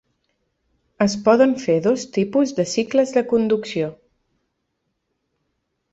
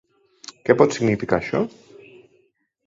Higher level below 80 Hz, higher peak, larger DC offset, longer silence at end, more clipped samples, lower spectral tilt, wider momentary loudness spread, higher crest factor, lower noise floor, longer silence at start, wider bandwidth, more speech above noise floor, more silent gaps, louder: second, -62 dBFS vs -54 dBFS; about the same, -2 dBFS vs -2 dBFS; neither; first, 2 s vs 1.2 s; neither; about the same, -5.5 dB/octave vs -6 dB/octave; second, 7 LU vs 19 LU; about the same, 18 dB vs 22 dB; first, -74 dBFS vs -65 dBFS; first, 1 s vs 0.65 s; about the same, 8.2 kHz vs 7.8 kHz; first, 56 dB vs 46 dB; neither; about the same, -19 LUFS vs -21 LUFS